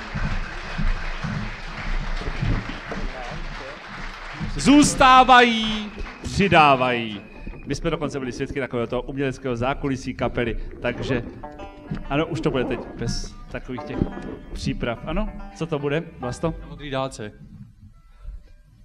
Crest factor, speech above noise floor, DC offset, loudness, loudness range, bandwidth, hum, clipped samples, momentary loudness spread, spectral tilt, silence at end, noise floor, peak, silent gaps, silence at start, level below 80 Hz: 20 dB; 26 dB; under 0.1%; -22 LUFS; 13 LU; 13 kHz; none; under 0.1%; 20 LU; -4.5 dB/octave; 0.3 s; -48 dBFS; -2 dBFS; none; 0 s; -34 dBFS